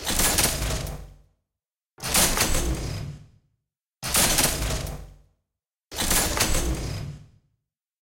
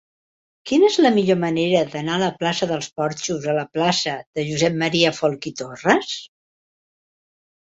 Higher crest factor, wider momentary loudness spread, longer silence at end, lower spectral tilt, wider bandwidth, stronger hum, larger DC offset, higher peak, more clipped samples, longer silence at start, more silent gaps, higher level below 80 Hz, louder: about the same, 20 dB vs 20 dB; first, 17 LU vs 9 LU; second, 0.75 s vs 1.4 s; second, -2 dB/octave vs -4.5 dB/octave; first, 17 kHz vs 8 kHz; neither; neither; second, -6 dBFS vs -2 dBFS; neither; second, 0 s vs 0.65 s; second, none vs 4.26-4.33 s; first, -34 dBFS vs -62 dBFS; second, -23 LUFS vs -20 LUFS